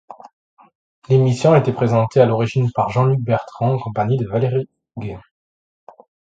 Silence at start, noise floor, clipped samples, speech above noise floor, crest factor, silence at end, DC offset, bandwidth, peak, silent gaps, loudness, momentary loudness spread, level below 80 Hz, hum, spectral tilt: 0.1 s; under -90 dBFS; under 0.1%; over 73 dB; 18 dB; 1.15 s; under 0.1%; 7.8 kHz; 0 dBFS; 0.33-0.57 s, 0.75-1.02 s; -17 LUFS; 16 LU; -52 dBFS; none; -8 dB/octave